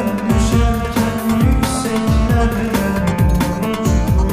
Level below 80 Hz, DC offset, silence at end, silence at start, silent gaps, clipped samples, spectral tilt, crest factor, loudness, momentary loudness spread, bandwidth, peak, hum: -20 dBFS; 0.2%; 0 s; 0 s; none; under 0.1%; -6 dB/octave; 12 dB; -16 LUFS; 3 LU; 15.5 kHz; -2 dBFS; none